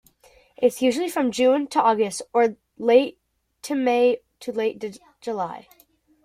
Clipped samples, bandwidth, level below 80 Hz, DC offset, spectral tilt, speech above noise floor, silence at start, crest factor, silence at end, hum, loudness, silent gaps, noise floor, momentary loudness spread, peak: under 0.1%; 15.5 kHz; -68 dBFS; under 0.1%; -4 dB/octave; 35 dB; 0.6 s; 18 dB; 0.65 s; none; -22 LUFS; none; -56 dBFS; 13 LU; -4 dBFS